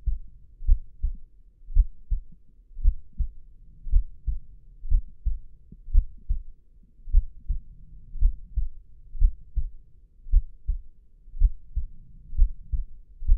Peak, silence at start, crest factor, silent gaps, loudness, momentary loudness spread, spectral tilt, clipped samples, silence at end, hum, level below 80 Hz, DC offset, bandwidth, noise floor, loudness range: -6 dBFS; 0.05 s; 18 dB; none; -32 LUFS; 19 LU; -15 dB/octave; under 0.1%; 0 s; none; -26 dBFS; under 0.1%; 0.3 kHz; -51 dBFS; 1 LU